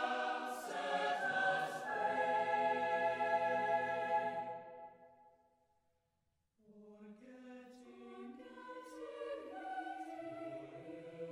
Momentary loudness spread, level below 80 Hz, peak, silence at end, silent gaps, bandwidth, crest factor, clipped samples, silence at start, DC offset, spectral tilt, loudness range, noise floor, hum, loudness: 20 LU; -86 dBFS; -24 dBFS; 0 s; none; 14.5 kHz; 18 dB; under 0.1%; 0 s; under 0.1%; -4 dB/octave; 22 LU; -83 dBFS; none; -38 LUFS